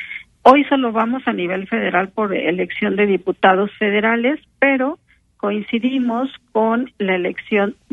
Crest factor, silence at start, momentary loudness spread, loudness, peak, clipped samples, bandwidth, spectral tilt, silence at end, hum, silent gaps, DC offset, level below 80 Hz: 18 dB; 0 s; 8 LU; -18 LUFS; 0 dBFS; under 0.1%; 6.6 kHz; -7.5 dB/octave; 0.2 s; none; none; under 0.1%; -60 dBFS